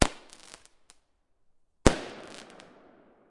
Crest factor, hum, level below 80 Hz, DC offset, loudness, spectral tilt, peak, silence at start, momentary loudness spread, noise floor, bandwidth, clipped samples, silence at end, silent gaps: 32 dB; none; -40 dBFS; under 0.1%; -28 LUFS; -4.5 dB/octave; 0 dBFS; 0 s; 25 LU; -68 dBFS; 11.5 kHz; under 0.1%; 1.15 s; none